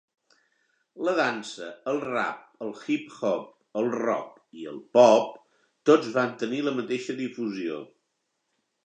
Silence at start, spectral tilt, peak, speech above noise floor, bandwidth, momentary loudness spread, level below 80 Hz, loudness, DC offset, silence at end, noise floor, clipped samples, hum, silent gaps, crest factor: 0.95 s; -5 dB/octave; -4 dBFS; 52 dB; 9.6 kHz; 17 LU; -82 dBFS; -26 LUFS; under 0.1%; 1 s; -78 dBFS; under 0.1%; none; none; 24 dB